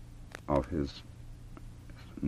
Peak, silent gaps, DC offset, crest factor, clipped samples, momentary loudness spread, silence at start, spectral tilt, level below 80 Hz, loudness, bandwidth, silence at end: -16 dBFS; none; under 0.1%; 22 dB; under 0.1%; 19 LU; 0 s; -7.5 dB/octave; -46 dBFS; -35 LUFS; 14.5 kHz; 0 s